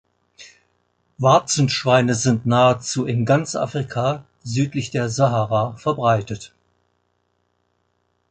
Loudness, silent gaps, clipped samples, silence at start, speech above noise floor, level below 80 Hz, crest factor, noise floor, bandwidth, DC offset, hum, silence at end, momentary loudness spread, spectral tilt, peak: -19 LUFS; none; under 0.1%; 0.4 s; 50 dB; -54 dBFS; 18 dB; -69 dBFS; 9.4 kHz; under 0.1%; 60 Hz at -40 dBFS; 1.85 s; 8 LU; -5 dB/octave; -2 dBFS